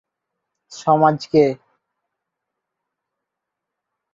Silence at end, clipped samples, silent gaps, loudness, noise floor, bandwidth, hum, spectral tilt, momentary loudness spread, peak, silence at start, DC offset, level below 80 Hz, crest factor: 2.6 s; under 0.1%; none; -17 LUFS; -82 dBFS; 7.8 kHz; none; -7 dB/octave; 10 LU; -2 dBFS; 0.7 s; under 0.1%; -64 dBFS; 20 dB